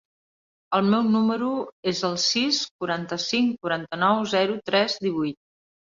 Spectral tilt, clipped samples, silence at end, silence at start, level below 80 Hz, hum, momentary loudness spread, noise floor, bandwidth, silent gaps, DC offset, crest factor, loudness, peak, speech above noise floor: -4 dB/octave; under 0.1%; 0.6 s; 0.7 s; -66 dBFS; none; 7 LU; under -90 dBFS; 7.6 kHz; 1.72-1.83 s, 2.71-2.79 s; under 0.1%; 18 dB; -24 LUFS; -8 dBFS; over 66 dB